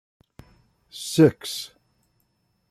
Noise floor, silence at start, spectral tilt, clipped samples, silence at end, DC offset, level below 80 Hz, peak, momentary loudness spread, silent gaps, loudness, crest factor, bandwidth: -70 dBFS; 0.95 s; -5.5 dB/octave; under 0.1%; 1.05 s; under 0.1%; -62 dBFS; -4 dBFS; 21 LU; none; -22 LUFS; 22 dB; 14.5 kHz